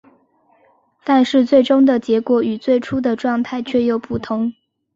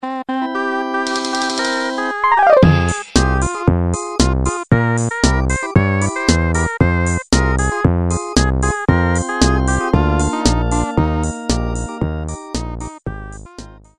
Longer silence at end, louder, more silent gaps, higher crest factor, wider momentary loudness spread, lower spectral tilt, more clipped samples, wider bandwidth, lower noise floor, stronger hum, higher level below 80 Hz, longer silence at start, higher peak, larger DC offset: first, 0.45 s vs 0.2 s; about the same, -17 LUFS vs -16 LUFS; neither; about the same, 16 dB vs 16 dB; about the same, 9 LU vs 9 LU; first, -6.5 dB/octave vs -5 dB/octave; neither; second, 7.6 kHz vs 11.5 kHz; first, -57 dBFS vs -37 dBFS; neither; second, -54 dBFS vs -24 dBFS; first, 1.05 s vs 0 s; about the same, -2 dBFS vs 0 dBFS; neither